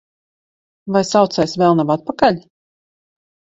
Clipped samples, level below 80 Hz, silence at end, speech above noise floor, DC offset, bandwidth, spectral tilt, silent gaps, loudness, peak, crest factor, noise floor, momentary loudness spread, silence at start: under 0.1%; -54 dBFS; 1 s; over 75 dB; under 0.1%; 8.2 kHz; -5.5 dB/octave; none; -16 LUFS; 0 dBFS; 18 dB; under -90 dBFS; 7 LU; 0.85 s